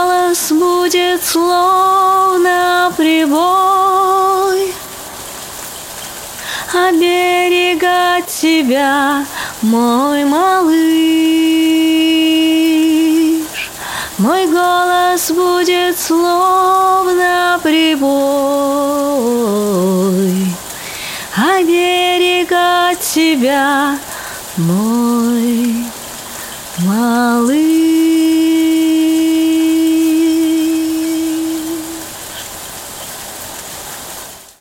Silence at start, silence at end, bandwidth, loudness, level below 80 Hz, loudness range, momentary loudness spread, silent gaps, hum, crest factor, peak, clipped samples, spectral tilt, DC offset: 0 s; 0.15 s; 17 kHz; -12 LUFS; -50 dBFS; 5 LU; 14 LU; none; none; 10 dB; -2 dBFS; under 0.1%; -4 dB/octave; under 0.1%